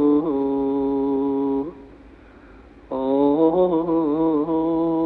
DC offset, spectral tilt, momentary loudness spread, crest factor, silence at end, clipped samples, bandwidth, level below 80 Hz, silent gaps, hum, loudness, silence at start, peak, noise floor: under 0.1%; -11 dB/octave; 7 LU; 14 dB; 0 s; under 0.1%; 4.3 kHz; -50 dBFS; none; none; -21 LUFS; 0 s; -6 dBFS; -46 dBFS